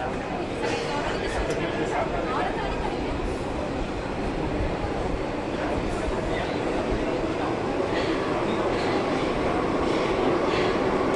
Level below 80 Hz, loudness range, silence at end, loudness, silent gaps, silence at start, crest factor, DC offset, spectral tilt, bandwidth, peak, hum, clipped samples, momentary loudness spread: -38 dBFS; 4 LU; 0 s; -26 LUFS; none; 0 s; 14 dB; under 0.1%; -6 dB/octave; 11.5 kHz; -12 dBFS; none; under 0.1%; 6 LU